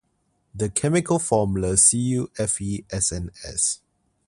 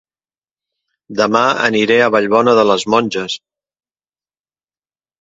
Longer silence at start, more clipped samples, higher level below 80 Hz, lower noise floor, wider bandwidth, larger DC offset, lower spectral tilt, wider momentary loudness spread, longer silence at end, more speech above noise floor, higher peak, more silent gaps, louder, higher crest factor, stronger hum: second, 0.55 s vs 1.1 s; neither; first, -44 dBFS vs -58 dBFS; second, -69 dBFS vs under -90 dBFS; first, 11.5 kHz vs 7.8 kHz; neither; about the same, -4 dB/octave vs -4 dB/octave; about the same, 13 LU vs 11 LU; second, 0.5 s vs 1.85 s; second, 47 dB vs over 77 dB; second, -4 dBFS vs 0 dBFS; neither; second, -21 LUFS vs -13 LUFS; about the same, 20 dB vs 16 dB; neither